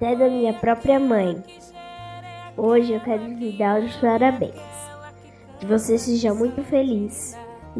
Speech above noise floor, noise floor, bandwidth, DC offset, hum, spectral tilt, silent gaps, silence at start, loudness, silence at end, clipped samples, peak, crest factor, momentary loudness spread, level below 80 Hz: 24 dB; -45 dBFS; 11 kHz; under 0.1%; none; -5.5 dB/octave; none; 0 s; -21 LUFS; 0 s; under 0.1%; -6 dBFS; 16 dB; 19 LU; -52 dBFS